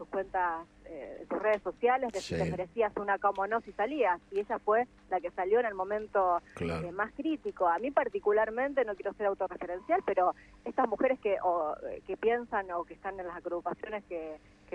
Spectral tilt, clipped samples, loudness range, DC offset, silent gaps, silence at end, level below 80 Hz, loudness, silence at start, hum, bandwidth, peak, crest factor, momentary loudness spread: -6 dB/octave; under 0.1%; 2 LU; under 0.1%; none; 0.35 s; -60 dBFS; -32 LUFS; 0 s; none; 10 kHz; -12 dBFS; 20 dB; 11 LU